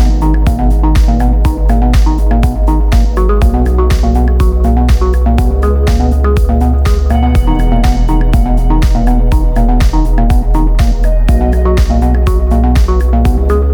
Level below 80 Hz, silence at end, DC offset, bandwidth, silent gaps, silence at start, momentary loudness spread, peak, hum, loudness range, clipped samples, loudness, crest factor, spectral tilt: -8 dBFS; 0 s; under 0.1%; 12 kHz; none; 0 s; 1 LU; 0 dBFS; none; 1 LU; under 0.1%; -11 LUFS; 8 dB; -7.5 dB/octave